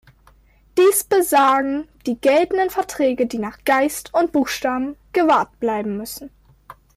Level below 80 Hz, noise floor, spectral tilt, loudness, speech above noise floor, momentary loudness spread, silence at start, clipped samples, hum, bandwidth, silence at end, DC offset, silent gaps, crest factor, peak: -54 dBFS; -53 dBFS; -3.5 dB/octave; -19 LUFS; 34 dB; 11 LU; 0.75 s; under 0.1%; none; 16 kHz; 0.25 s; under 0.1%; none; 14 dB; -6 dBFS